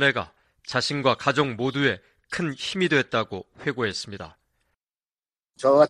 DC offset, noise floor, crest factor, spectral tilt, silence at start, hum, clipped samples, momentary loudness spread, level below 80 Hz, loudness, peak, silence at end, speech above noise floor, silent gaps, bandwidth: under 0.1%; under -90 dBFS; 20 dB; -5 dB/octave; 0 s; none; under 0.1%; 14 LU; -62 dBFS; -25 LUFS; -4 dBFS; 0 s; over 66 dB; none; 11 kHz